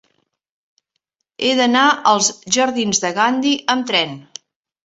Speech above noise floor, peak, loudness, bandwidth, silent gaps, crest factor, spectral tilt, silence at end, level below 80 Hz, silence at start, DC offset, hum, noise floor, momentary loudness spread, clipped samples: 58 dB; 0 dBFS; -16 LUFS; 8.2 kHz; none; 18 dB; -2 dB/octave; 0.65 s; -64 dBFS; 1.4 s; under 0.1%; none; -75 dBFS; 5 LU; under 0.1%